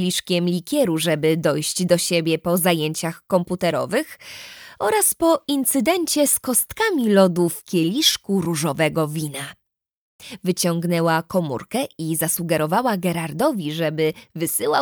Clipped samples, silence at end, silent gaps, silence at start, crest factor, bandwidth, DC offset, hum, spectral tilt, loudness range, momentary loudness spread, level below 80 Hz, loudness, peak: under 0.1%; 0 s; 9.95-10.19 s; 0 s; 18 dB; over 20 kHz; under 0.1%; none; -4 dB/octave; 5 LU; 9 LU; -60 dBFS; -20 LUFS; -4 dBFS